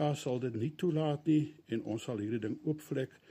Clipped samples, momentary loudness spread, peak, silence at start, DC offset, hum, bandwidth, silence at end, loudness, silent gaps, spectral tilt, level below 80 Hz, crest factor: under 0.1%; 7 LU; -20 dBFS; 0 s; under 0.1%; none; 15.5 kHz; 0.25 s; -35 LUFS; none; -7 dB/octave; -76 dBFS; 14 dB